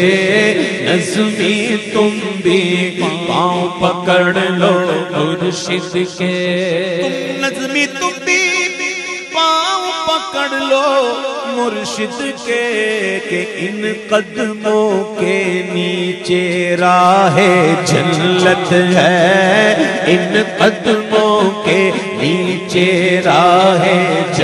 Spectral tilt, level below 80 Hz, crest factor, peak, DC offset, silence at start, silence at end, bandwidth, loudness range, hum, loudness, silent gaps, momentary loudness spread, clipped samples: -4.5 dB/octave; -56 dBFS; 14 dB; 0 dBFS; under 0.1%; 0 s; 0 s; 12.5 kHz; 5 LU; none; -13 LUFS; none; 8 LU; under 0.1%